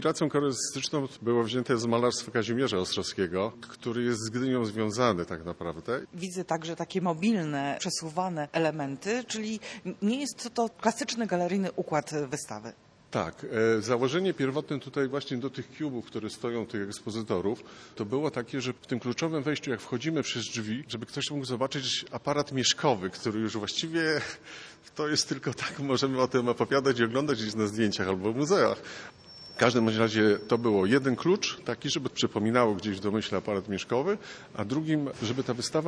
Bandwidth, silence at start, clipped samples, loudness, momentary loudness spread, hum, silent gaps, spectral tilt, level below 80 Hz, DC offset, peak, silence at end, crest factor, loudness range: 11 kHz; 0 s; under 0.1%; -29 LUFS; 10 LU; none; none; -4.5 dB/octave; -66 dBFS; under 0.1%; -8 dBFS; 0 s; 22 dB; 5 LU